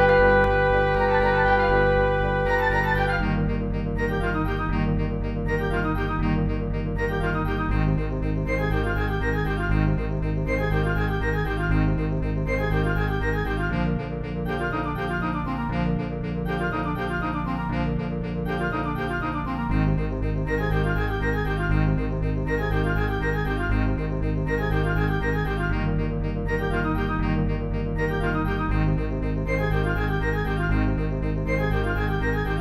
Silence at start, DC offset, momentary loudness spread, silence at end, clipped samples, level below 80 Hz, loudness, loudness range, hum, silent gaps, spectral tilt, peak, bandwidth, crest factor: 0 s; under 0.1%; 6 LU; 0 s; under 0.1%; -30 dBFS; -25 LUFS; 4 LU; none; none; -8 dB/octave; -6 dBFS; 12.5 kHz; 16 dB